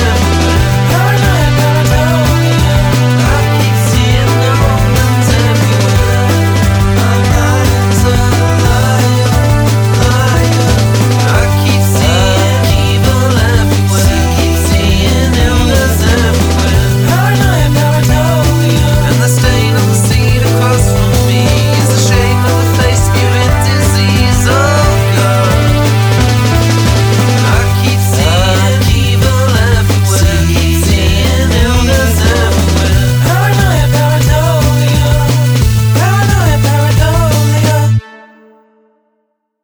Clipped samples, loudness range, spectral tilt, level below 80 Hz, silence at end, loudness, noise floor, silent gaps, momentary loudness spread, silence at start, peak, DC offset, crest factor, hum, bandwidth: under 0.1%; 0 LU; -5 dB/octave; -18 dBFS; 1.5 s; -9 LUFS; -63 dBFS; none; 1 LU; 0 s; 0 dBFS; 0.2%; 8 dB; none; over 20 kHz